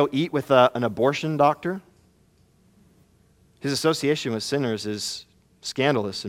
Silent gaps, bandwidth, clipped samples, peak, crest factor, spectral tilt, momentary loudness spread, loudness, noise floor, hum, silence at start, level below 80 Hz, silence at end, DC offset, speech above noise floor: none; 17 kHz; under 0.1%; -4 dBFS; 22 dB; -5 dB/octave; 13 LU; -23 LUFS; -60 dBFS; none; 0 s; -64 dBFS; 0 s; under 0.1%; 37 dB